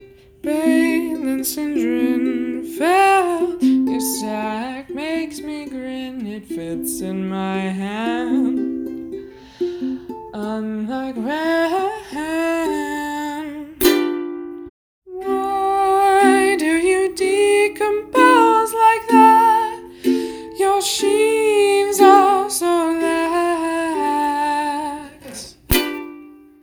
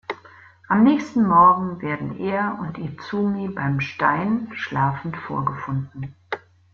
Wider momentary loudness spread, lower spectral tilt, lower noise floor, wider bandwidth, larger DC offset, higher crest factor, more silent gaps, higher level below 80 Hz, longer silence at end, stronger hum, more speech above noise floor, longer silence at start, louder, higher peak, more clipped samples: about the same, 16 LU vs 17 LU; second, -4 dB/octave vs -8 dB/octave; second, -41 dBFS vs -48 dBFS; first, over 20 kHz vs 7 kHz; neither; about the same, 18 dB vs 18 dB; first, 14.69-15.02 s vs none; first, -44 dBFS vs -56 dBFS; about the same, 0.3 s vs 0.35 s; neither; second, 21 dB vs 27 dB; about the same, 0 s vs 0.1 s; first, -18 LUFS vs -21 LUFS; first, 0 dBFS vs -4 dBFS; neither